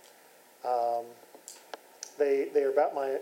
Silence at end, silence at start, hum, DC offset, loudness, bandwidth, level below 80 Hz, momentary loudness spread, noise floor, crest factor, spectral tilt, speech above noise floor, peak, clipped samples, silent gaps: 0 s; 0.65 s; none; under 0.1%; -29 LUFS; 16.5 kHz; under -90 dBFS; 21 LU; -58 dBFS; 18 dB; -3 dB/octave; 30 dB; -14 dBFS; under 0.1%; none